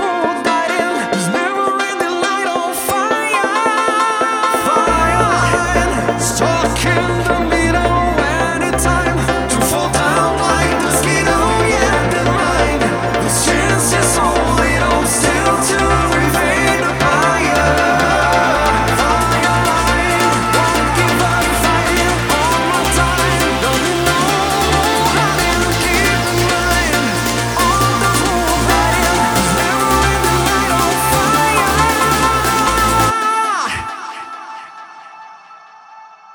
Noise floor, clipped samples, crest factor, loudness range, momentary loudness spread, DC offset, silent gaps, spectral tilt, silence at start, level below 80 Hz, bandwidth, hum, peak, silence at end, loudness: -40 dBFS; under 0.1%; 14 dB; 2 LU; 4 LU; under 0.1%; none; -3.5 dB/octave; 0 s; -28 dBFS; over 20 kHz; none; 0 dBFS; 0 s; -14 LUFS